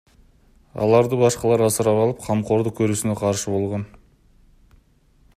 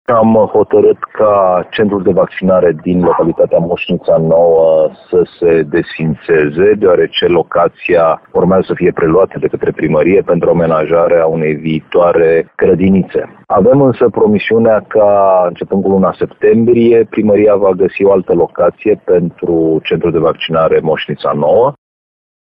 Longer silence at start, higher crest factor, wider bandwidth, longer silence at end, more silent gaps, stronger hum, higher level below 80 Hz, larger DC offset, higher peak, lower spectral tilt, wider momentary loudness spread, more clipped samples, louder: first, 0.75 s vs 0.1 s; first, 18 dB vs 10 dB; first, 15 kHz vs 5.2 kHz; first, 1.5 s vs 0.8 s; neither; neither; second, -52 dBFS vs -44 dBFS; neither; second, -4 dBFS vs 0 dBFS; second, -6 dB/octave vs -10.5 dB/octave; first, 9 LU vs 6 LU; neither; second, -20 LUFS vs -11 LUFS